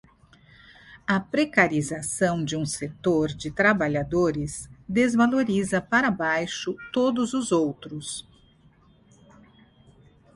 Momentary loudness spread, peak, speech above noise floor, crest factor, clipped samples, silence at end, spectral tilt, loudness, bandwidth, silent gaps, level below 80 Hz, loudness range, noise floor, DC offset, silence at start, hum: 12 LU; -4 dBFS; 33 dB; 22 dB; under 0.1%; 2.15 s; -5 dB/octave; -24 LUFS; 11.5 kHz; none; -54 dBFS; 6 LU; -57 dBFS; under 0.1%; 0.9 s; none